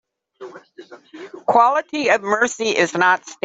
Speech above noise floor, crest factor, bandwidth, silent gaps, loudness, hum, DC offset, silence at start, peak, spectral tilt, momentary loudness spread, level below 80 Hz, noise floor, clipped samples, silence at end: 22 dB; 18 dB; 8.2 kHz; none; -17 LUFS; none; under 0.1%; 0.4 s; -2 dBFS; -3 dB/octave; 23 LU; -66 dBFS; -40 dBFS; under 0.1%; 0.1 s